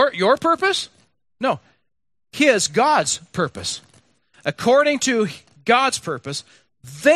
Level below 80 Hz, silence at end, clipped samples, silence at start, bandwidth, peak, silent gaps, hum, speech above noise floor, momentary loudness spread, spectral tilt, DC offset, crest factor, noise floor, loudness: -62 dBFS; 0 s; under 0.1%; 0 s; 14 kHz; -2 dBFS; none; none; 56 dB; 13 LU; -3 dB/octave; under 0.1%; 18 dB; -75 dBFS; -19 LUFS